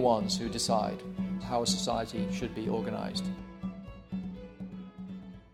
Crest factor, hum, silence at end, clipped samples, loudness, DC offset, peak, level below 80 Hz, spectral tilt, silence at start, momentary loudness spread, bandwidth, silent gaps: 20 dB; none; 0.05 s; under 0.1%; -33 LUFS; under 0.1%; -14 dBFS; -54 dBFS; -4.5 dB/octave; 0 s; 15 LU; 15 kHz; none